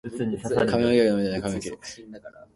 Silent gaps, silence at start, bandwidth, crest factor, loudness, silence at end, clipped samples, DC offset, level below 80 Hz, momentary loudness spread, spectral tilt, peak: none; 0.05 s; 11.5 kHz; 18 dB; -24 LUFS; 0.25 s; under 0.1%; under 0.1%; -52 dBFS; 21 LU; -6 dB/octave; -8 dBFS